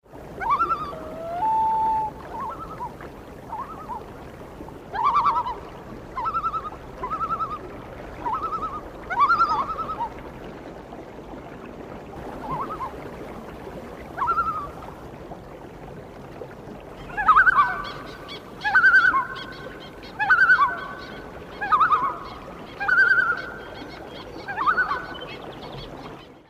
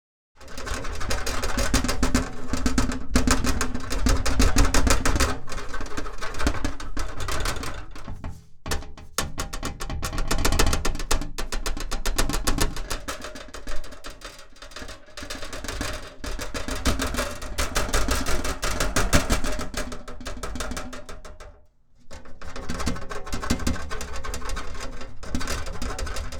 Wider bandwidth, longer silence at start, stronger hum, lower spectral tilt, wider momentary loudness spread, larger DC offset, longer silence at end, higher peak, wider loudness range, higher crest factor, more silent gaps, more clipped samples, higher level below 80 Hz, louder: second, 15.5 kHz vs 19 kHz; second, 0.1 s vs 0.4 s; neither; first, -5 dB/octave vs -3.5 dB/octave; first, 22 LU vs 17 LU; neither; about the same, 0.05 s vs 0 s; second, -6 dBFS vs -2 dBFS; about the same, 11 LU vs 10 LU; about the same, 20 dB vs 22 dB; neither; neither; second, -48 dBFS vs -30 dBFS; first, -22 LUFS vs -28 LUFS